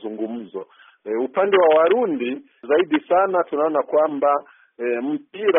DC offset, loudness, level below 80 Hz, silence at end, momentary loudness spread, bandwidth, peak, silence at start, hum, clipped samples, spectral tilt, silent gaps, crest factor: under 0.1%; -20 LUFS; -70 dBFS; 0 s; 14 LU; 3.7 kHz; -6 dBFS; 0 s; none; under 0.1%; 0 dB/octave; none; 16 dB